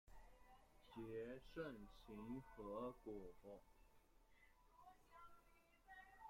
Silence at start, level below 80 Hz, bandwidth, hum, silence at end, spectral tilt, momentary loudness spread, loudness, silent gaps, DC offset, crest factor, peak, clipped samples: 0.05 s; -72 dBFS; 16 kHz; none; 0 s; -7 dB/octave; 14 LU; -56 LUFS; none; under 0.1%; 20 dB; -38 dBFS; under 0.1%